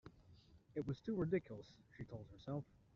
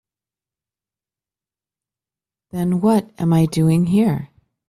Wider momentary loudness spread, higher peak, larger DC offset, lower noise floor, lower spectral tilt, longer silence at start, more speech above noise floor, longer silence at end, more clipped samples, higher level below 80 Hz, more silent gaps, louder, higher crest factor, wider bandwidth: first, 16 LU vs 9 LU; second, -28 dBFS vs -6 dBFS; neither; second, -67 dBFS vs under -90 dBFS; about the same, -8 dB/octave vs -8 dB/octave; second, 0.05 s vs 2.55 s; second, 22 dB vs over 73 dB; second, 0.3 s vs 0.45 s; neither; second, -70 dBFS vs -52 dBFS; neither; second, -46 LUFS vs -18 LUFS; about the same, 18 dB vs 14 dB; second, 7.2 kHz vs 14 kHz